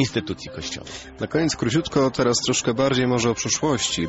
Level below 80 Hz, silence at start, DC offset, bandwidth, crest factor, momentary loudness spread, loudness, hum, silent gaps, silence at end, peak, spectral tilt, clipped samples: -48 dBFS; 0 s; under 0.1%; 8.2 kHz; 14 dB; 11 LU; -22 LUFS; none; none; 0 s; -8 dBFS; -4 dB/octave; under 0.1%